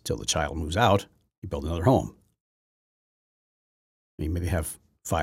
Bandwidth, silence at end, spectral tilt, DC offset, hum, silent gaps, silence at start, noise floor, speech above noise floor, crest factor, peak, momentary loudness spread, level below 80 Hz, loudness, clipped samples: 16.5 kHz; 0 s; -5 dB/octave; under 0.1%; none; 1.38-1.42 s, 2.40-4.18 s; 0.05 s; under -90 dBFS; over 64 dB; 22 dB; -6 dBFS; 17 LU; -42 dBFS; -27 LUFS; under 0.1%